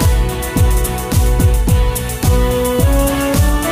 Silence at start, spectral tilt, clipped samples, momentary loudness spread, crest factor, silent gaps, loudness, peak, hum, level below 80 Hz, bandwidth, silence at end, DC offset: 0 s; -5.5 dB/octave; under 0.1%; 4 LU; 10 dB; none; -15 LUFS; -2 dBFS; none; -16 dBFS; 15.5 kHz; 0 s; under 0.1%